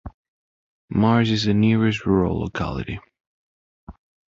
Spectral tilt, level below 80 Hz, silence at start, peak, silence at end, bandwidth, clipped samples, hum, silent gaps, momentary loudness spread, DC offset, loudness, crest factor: -7 dB/octave; -42 dBFS; 0.05 s; -6 dBFS; 0.4 s; 7.6 kHz; under 0.1%; none; 0.14-0.88 s, 3.27-3.87 s; 11 LU; under 0.1%; -21 LUFS; 16 dB